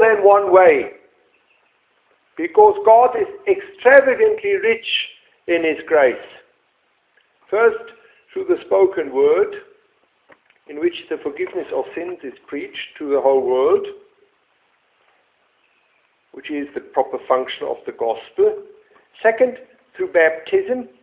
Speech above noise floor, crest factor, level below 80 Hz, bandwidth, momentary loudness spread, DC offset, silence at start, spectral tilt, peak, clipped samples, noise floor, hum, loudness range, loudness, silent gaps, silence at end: 47 dB; 18 dB; -62 dBFS; 4 kHz; 18 LU; under 0.1%; 0 s; -7.5 dB/octave; 0 dBFS; under 0.1%; -64 dBFS; none; 11 LU; -17 LUFS; none; 0.15 s